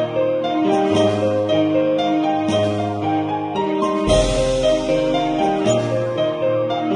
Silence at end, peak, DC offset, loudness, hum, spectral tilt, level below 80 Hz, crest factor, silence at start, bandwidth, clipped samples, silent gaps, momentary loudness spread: 0 s; -4 dBFS; under 0.1%; -19 LUFS; none; -5.5 dB/octave; -36 dBFS; 14 dB; 0 s; 11 kHz; under 0.1%; none; 4 LU